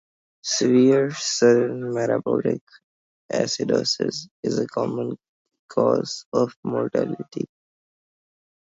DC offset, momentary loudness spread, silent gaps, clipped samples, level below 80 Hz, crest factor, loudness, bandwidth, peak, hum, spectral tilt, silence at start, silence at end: under 0.1%; 13 LU; 2.61-2.67 s, 2.84-3.29 s, 4.31-4.43 s, 5.28-5.45 s, 5.59-5.69 s, 6.26-6.32 s, 6.56-6.63 s; under 0.1%; -68 dBFS; 18 dB; -23 LUFS; 7.8 kHz; -4 dBFS; none; -4.5 dB/octave; 0.45 s; 1.2 s